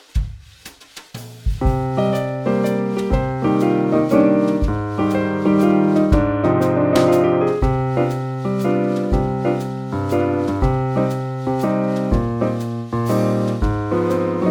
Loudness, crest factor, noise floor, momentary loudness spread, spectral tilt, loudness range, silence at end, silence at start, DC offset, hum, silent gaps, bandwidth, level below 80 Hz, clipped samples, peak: -19 LUFS; 18 dB; -42 dBFS; 9 LU; -8 dB/octave; 4 LU; 0 s; 0.15 s; under 0.1%; none; none; 18 kHz; -28 dBFS; under 0.1%; 0 dBFS